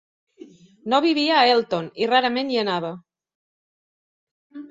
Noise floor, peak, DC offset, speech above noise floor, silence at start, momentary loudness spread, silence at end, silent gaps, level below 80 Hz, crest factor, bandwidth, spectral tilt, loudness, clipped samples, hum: -47 dBFS; -4 dBFS; under 0.1%; 27 dB; 0.85 s; 18 LU; 0.05 s; 3.35-4.50 s; -70 dBFS; 20 dB; 7.8 kHz; -5 dB/octave; -20 LUFS; under 0.1%; none